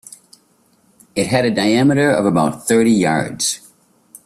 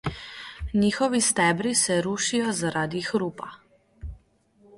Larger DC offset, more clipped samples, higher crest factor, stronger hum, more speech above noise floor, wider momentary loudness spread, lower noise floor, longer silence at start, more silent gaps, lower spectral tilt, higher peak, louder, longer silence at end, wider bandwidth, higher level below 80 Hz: neither; neither; about the same, 16 dB vs 18 dB; neither; first, 42 dB vs 36 dB; second, 7 LU vs 20 LU; about the same, -57 dBFS vs -60 dBFS; first, 1.15 s vs 0.05 s; neither; about the same, -4.5 dB/octave vs -3.5 dB/octave; first, -2 dBFS vs -8 dBFS; first, -16 LUFS vs -24 LUFS; about the same, 0.7 s vs 0.65 s; first, 15 kHz vs 11.5 kHz; second, -54 dBFS vs -46 dBFS